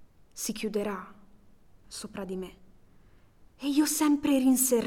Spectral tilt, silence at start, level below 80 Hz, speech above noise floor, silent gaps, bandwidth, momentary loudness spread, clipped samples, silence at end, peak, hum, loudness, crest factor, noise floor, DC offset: -3.5 dB/octave; 0 s; -60 dBFS; 29 dB; none; 18.5 kHz; 20 LU; under 0.1%; 0 s; -12 dBFS; none; -28 LUFS; 18 dB; -57 dBFS; under 0.1%